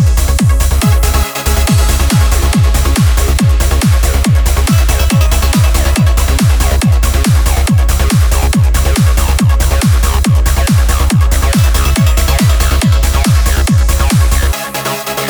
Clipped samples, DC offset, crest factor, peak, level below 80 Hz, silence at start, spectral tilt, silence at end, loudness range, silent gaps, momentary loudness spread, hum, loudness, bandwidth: under 0.1%; under 0.1%; 8 dB; 0 dBFS; -10 dBFS; 0 s; -5 dB/octave; 0 s; 0 LU; none; 1 LU; none; -11 LUFS; over 20 kHz